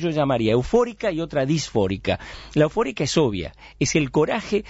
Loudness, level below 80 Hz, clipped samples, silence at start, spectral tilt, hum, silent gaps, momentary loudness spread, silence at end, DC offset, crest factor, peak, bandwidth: -22 LUFS; -44 dBFS; under 0.1%; 0 s; -5.5 dB/octave; none; none; 7 LU; 0 s; under 0.1%; 16 dB; -6 dBFS; 8 kHz